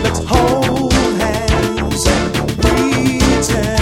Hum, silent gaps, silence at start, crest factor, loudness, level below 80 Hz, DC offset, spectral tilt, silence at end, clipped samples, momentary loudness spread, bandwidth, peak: none; none; 0 s; 14 dB; -14 LUFS; -22 dBFS; under 0.1%; -5 dB/octave; 0 s; under 0.1%; 3 LU; 17 kHz; 0 dBFS